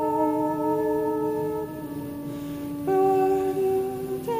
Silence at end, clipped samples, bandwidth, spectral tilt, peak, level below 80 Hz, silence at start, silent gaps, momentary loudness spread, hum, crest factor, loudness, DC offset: 0 s; under 0.1%; 15.5 kHz; -7.5 dB/octave; -12 dBFS; -56 dBFS; 0 s; none; 12 LU; none; 14 dB; -26 LUFS; under 0.1%